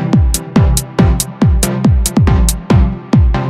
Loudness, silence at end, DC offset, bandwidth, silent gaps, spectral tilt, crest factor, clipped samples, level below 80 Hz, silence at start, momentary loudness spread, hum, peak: -12 LUFS; 0 s; under 0.1%; 16.5 kHz; none; -6 dB/octave; 10 dB; under 0.1%; -16 dBFS; 0 s; 2 LU; none; 0 dBFS